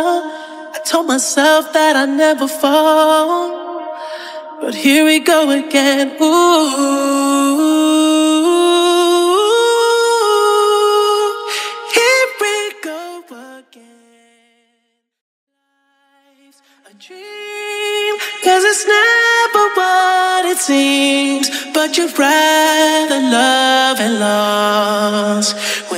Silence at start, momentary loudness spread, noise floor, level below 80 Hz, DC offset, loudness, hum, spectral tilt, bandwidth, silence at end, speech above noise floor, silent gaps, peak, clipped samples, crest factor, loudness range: 0 s; 13 LU; -66 dBFS; -74 dBFS; under 0.1%; -12 LUFS; none; -2 dB/octave; 16 kHz; 0 s; 54 dB; 15.21-15.47 s; 0 dBFS; under 0.1%; 14 dB; 6 LU